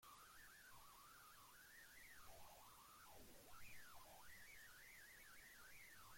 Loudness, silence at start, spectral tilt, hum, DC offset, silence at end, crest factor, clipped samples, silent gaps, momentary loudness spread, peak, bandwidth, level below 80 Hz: -63 LUFS; 0 s; -1.5 dB/octave; none; under 0.1%; 0 s; 16 dB; under 0.1%; none; 2 LU; -48 dBFS; 16.5 kHz; -78 dBFS